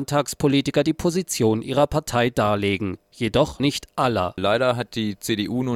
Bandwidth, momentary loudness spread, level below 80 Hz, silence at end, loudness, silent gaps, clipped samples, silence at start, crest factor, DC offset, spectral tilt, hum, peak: 16.5 kHz; 5 LU; -46 dBFS; 0 s; -22 LUFS; none; under 0.1%; 0 s; 16 dB; under 0.1%; -5 dB/octave; none; -6 dBFS